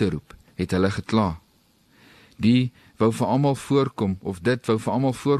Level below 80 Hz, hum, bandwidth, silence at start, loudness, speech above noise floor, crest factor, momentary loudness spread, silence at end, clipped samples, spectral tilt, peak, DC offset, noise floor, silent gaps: -50 dBFS; none; 13 kHz; 0 s; -23 LUFS; 39 dB; 16 dB; 9 LU; 0 s; under 0.1%; -7 dB/octave; -8 dBFS; under 0.1%; -61 dBFS; none